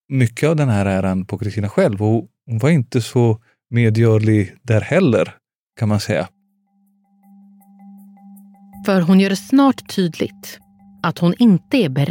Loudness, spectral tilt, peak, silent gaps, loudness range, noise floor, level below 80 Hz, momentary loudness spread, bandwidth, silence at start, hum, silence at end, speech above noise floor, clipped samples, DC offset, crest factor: -17 LUFS; -7 dB/octave; -4 dBFS; 5.58-5.67 s; 8 LU; -62 dBFS; -60 dBFS; 10 LU; 17 kHz; 0.1 s; none; 0 s; 46 dB; under 0.1%; under 0.1%; 14 dB